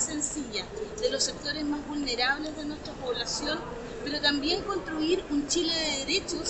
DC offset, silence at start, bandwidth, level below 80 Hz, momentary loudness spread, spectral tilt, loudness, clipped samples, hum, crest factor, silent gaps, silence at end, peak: under 0.1%; 0 s; 8.8 kHz; -50 dBFS; 9 LU; -2 dB/octave; -29 LUFS; under 0.1%; none; 20 dB; none; 0 s; -12 dBFS